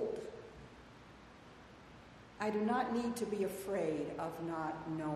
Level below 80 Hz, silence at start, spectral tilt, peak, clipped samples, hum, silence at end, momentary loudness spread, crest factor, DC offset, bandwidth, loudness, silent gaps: -66 dBFS; 0 s; -6 dB/octave; -22 dBFS; under 0.1%; none; 0 s; 22 LU; 18 dB; under 0.1%; 14.5 kHz; -39 LUFS; none